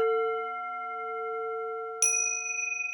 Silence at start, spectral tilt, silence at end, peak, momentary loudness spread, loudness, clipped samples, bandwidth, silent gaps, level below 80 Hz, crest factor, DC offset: 0 s; 2.5 dB/octave; 0 s; -10 dBFS; 11 LU; -29 LUFS; under 0.1%; 19 kHz; none; -86 dBFS; 20 dB; under 0.1%